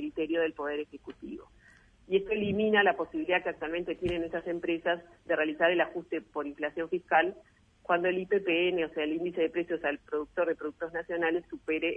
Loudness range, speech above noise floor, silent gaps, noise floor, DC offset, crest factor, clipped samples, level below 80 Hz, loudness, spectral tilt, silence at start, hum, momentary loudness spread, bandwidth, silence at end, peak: 2 LU; 29 dB; none; -60 dBFS; under 0.1%; 20 dB; under 0.1%; -62 dBFS; -30 LUFS; -7 dB/octave; 0 s; none; 10 LU; 4.5 kHz; 0 s; -12 dBFS